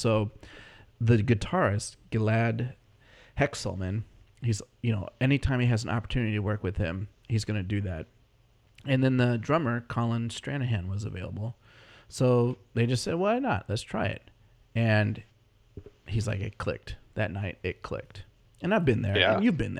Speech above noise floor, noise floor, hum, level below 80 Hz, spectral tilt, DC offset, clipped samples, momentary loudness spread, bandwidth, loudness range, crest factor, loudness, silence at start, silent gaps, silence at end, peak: 35 dB; -63 dBFS; none; -48 dBFS; -6.5 dB/octave; under 0.1%; under 0.1%; 14 LU; 11.5 kHz; 3 LU; 22 dB; -29 LUFS; 0 s; none; 0 s; -8 dBFS